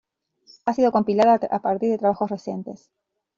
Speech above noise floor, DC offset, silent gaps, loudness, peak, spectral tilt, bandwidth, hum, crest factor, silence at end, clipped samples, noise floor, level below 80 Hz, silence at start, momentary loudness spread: 36 dB; under 0.1%; none; -22 LUFS; -6 dBFS; -6 dB/octave; 7.6 kHz; none; 16 dB; 0.6 s; under 0.1%; -57 dBFS; -64 dBFS; 0.65 s; 14 LU